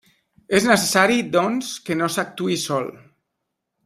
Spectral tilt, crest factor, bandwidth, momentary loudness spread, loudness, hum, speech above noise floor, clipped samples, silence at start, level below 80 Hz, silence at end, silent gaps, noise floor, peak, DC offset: -3.5 dB/octave; 20 dB; 15 kHz; 10 LU; -20 LUFS; none; 59 dB; under 0.1%; 0.5 s; -60 dBFS; 0.9 s; none; -79 dBFS; -2 dBFS; under 0.1%